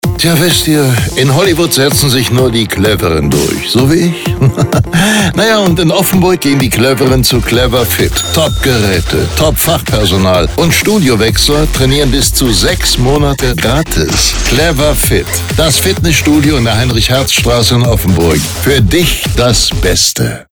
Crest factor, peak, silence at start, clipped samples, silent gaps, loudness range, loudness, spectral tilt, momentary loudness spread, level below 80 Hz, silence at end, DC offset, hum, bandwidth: 10 dB; 0 dBFS; 0.05 s; under 0.1%; none; 1 LU; -9 LUFS; -4 dB/octave; 3 LU; -20 dBFS; 0.1 s; under 0.1%; none; over 20 kHz